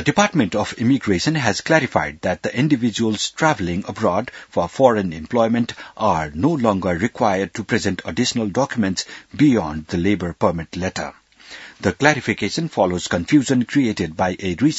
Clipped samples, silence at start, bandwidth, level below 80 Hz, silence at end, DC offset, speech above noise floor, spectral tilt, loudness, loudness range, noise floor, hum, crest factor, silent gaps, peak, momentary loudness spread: under 0.1%; 0 s; 8 kHz; -50 dBFS; 0 s; under 0.1%; 21 dB; -5 dB/octave; -20 LUFS; 2 LU; -40 dBFS; none; 20 dB; none; 0 dBFS; 8 LU